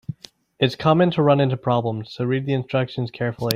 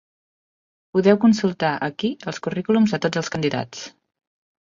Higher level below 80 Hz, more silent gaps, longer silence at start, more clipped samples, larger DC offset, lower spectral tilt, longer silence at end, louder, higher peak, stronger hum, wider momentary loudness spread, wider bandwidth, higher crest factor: first, -56 dBFS vs -62 dBFS; neither; second, 0.1 s vs 0.95 s; neither; neither; about the same, -7 dB/octave vs -6 dB/octave; second, 0 s vs 0.8 s; about the same, -21 LUFS vs -21 LUFS; about the same, 0 dBFS vs -2 dBFS; neither; about the same, 10 LU vs 12 LU; first, 16 kHz vs 7.4 kHz; about the same, 22 dB vs 20 dB